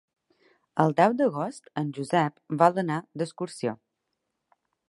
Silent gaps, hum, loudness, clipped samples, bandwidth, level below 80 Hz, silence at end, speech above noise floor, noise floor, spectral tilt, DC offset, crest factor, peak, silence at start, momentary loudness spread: none; none; -26 LUFS; under 0.1%; 11.5 kHz; -76 dBFS; 1.15 s; 55 dB; -81 dBFS; -6.5 dB/octave; under 0.1%; 22 dB; -4 dBFS; 0.75 s; 12 LU